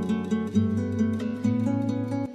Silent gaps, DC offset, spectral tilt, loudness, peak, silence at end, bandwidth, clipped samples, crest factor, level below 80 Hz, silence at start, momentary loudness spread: none; under 0.1%; -8 dB/octave; -26 LUFS; -12 dBFS; 0 s; 8.8 kHz; under 0.1%; 14 dB; -48 dBFS; 0 s; 2 LU